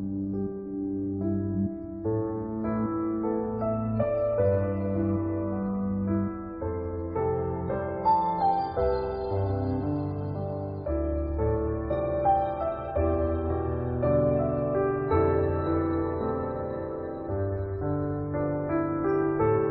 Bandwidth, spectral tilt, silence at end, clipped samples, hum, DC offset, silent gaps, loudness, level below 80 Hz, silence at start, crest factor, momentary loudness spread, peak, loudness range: 5 kHz; -13 dB/octave; 0 s; under 0.1%; none; under 0.1%; none; -28 LUFS; -42 dBFS; 0 s; 16 dB; 8 LU; -12 dBFS; 3 LU